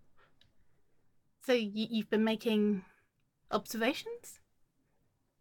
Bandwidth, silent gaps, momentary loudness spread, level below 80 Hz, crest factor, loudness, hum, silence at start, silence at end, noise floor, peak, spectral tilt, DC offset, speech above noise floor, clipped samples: 17.5 kHz; none; 14 LU; -74 dBFS; 20 dB; -33 LUFS; none; 1.45 s; 1.05 s; -75 dBFS; -16 dBFS; -5 dB/octave; under 0.1%; 43 dB; under 0.1%